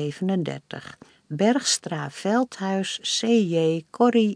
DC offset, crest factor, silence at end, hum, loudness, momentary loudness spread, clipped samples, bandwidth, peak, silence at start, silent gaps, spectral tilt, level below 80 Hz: under 0.1%; 18 dB; 0 s; none; -23 LUFS; 16 LU; under 0.1%; 10.5 kHz; -6 dBFS; 0 s; none; -4.5 dB/octave; -74 dBFS